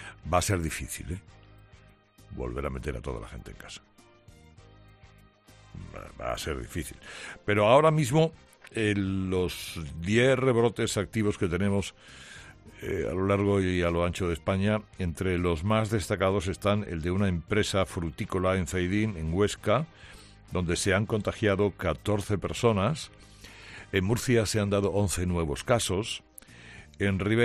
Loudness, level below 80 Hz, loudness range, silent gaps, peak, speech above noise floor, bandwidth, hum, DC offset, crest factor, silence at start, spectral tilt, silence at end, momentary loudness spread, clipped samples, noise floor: -28 LUFS; -48 dBFS; 13 LU; none; -8 dBFS; 29 dB; 14 kHz; none; under 0.1%; 22 dB; 0 s; -5.5 dB/octave; 0 s; 19 LU; under 0.1%; -57 dBFS